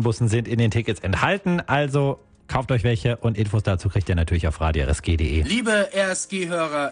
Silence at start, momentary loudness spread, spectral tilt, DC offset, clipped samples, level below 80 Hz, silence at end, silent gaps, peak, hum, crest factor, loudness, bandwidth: 0 s; 4 LU; -5.5 dB/octave; under 0.1%; under 0.1%; -34 dBFS; 0 s; none; -4 dBFS; none; 18 dB; -22 LUFS; 10 kHz